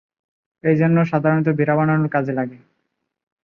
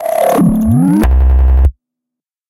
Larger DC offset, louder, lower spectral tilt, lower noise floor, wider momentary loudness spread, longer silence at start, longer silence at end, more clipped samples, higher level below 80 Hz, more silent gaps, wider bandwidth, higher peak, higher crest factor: neither; second, -18 LUFS vs -11 LUFS; first, -10.5 dB/octave vs -8.5 dB/octave; second, -74 dBFS vs -82 dBFS; first, 9 LU vs 2 LU; first, 0.65 s vs 0 s; about the same, 0.9 s vs 0.8 s; neither; second, -62 dBFS vs -12 dBFS; neither; second, 4.3 kHz vs 14.5 kHz; second, -4 dBFS vs 0 dBFS; first, 16 dB vs 10 dB